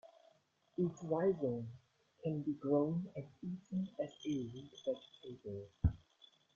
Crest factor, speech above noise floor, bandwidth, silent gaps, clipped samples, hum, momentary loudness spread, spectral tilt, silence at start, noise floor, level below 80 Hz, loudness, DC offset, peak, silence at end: 20 dB; 33 dB; 7.2 kHz; none; under 0.1%; none; 14 LU; -8.5 dB/octave; 0.05 s; -72 dBFS; -56 dBFS; -40 LUFS; under 0.1%; -20 dBFS; 0.6 s